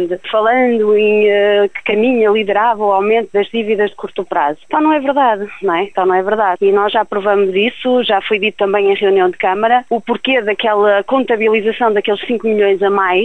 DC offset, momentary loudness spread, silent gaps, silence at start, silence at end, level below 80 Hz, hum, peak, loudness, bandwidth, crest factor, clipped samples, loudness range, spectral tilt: 0.8%; 5 LU; none; 0 s; 0 s; -54 dBFS; none; 0 dBFS; -13 LUFS; 8.6 kHz; 12 dB; under 0.1%; 2 LU; -6.5 dB/octave